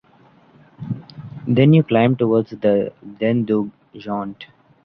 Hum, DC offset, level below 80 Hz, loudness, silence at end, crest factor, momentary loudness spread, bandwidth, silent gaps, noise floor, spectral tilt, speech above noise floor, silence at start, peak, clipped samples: none; under 0.1%; -56 dBFS; -18 LUFS; 0.4 s; 18 dB; 19 LU; 5.6 kHz; none; -52 dBFS; -10.5 dB/octave; 35 dB; 0.8 s; -2 dBFS; under 0.1%